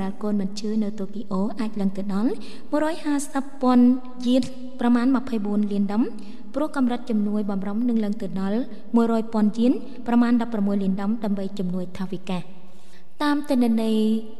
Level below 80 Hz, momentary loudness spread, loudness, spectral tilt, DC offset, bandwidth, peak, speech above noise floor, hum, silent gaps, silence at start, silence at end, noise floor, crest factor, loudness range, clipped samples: -62 dBFS; 9 LU; -24 LUFS; -7 dB/octave; 4%; 12 kHz; -8 dBFS; 30 dB; none; none; 0 s; 0.05 s; -53 dBFS; 14 dB; 4 LU; under 0.1%